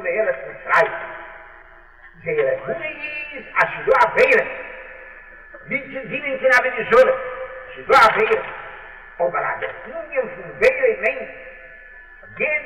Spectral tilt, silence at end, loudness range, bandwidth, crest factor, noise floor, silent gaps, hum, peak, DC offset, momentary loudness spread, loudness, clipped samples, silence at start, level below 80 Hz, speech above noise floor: -4 dB/octave; 0 s; 6 LU; 13.5 kHz; 16 dB; -46 dBFS; none; none; -6 dBFS; 0.2%; 23 LU; -19 LUFS; under 0.1%; 0 s; -50 dBFS; 27 dB